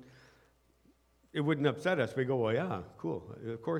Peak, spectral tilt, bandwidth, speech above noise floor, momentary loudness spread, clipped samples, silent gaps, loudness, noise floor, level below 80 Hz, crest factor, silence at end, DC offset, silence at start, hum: -14 dBFS; -7 dB/octave; 13.5 kHz; 35 dB; 10 LU; under 0.1%; none; -34 LUFS; -68 dBFS; -70 dBFS; 20 dB; 0 s; under 0.1%; 0 s; none